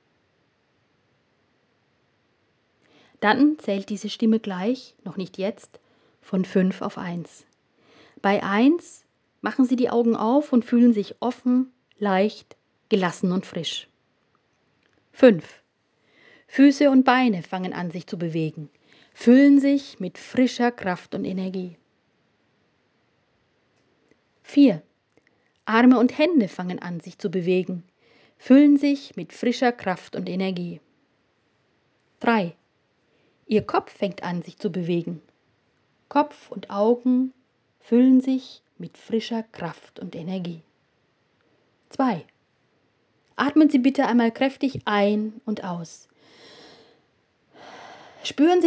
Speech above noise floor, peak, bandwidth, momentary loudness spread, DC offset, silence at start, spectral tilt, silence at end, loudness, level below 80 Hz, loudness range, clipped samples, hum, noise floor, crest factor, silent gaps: 46 dB; -2 dBFS; 8 kHz; 18 LU; under 0.1%; 3.2 s; -6.5 dB/octave; 0 s; -22 LUFS; -70 dBFS; 9 LU; under 0.1%; none; -67 dBFS; 22 dB; none